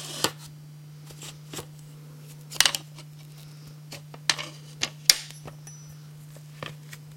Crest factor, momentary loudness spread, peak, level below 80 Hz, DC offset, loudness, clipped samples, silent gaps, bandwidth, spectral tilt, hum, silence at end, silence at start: 32 dB; 24 LU; 0 dBFS; -64 dBFS; under 0.1%; -25 LUFS; under 0.1%; none; 16.5 kHz; -1 dB/octave; none; 0 s; 0 s